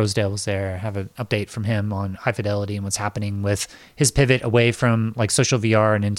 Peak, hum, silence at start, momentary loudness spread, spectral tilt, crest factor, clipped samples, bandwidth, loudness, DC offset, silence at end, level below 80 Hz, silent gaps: -2 dBFS; none; 0 s; 9 LU; -5 dB/octave; 18 dB; under 0.1%; 15 kHz; -21 LUFS; under 0.1%; 0 s; -44 dBFS; none